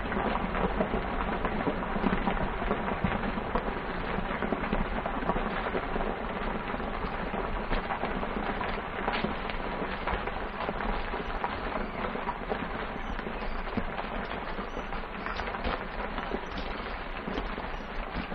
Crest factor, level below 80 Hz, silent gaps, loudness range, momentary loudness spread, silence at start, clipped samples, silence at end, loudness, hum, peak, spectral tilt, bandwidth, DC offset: 22 dB; -38 dBFS; none; 4 LU; 6 LU; 0 s; under 0.1%; 0 s; -33 LUFS; none; -10 dBFS; -7.5 dB/octave; 6.2 kHz; under 0.1%